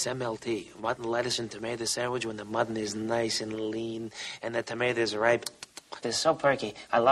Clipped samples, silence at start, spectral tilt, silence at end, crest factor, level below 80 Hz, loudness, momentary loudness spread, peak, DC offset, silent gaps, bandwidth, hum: under 0.1%; 0 s; -3.5 dB/octave; 0 s; 22 dB; -66 dBFS; -30 LUFS; 10 LU; -8 dBFS; under 0.1%; none; 14.5 kHz; none